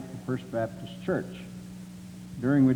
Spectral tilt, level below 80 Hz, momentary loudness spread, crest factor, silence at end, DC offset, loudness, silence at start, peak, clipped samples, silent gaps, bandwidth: -8 dB/octave; -58 dBFS; 16 LU; 16 dB; 0 s; under 0.1%; -31 LUFS; 0 s; -12 dBFS; under 0.1%; none; 13.5 kHz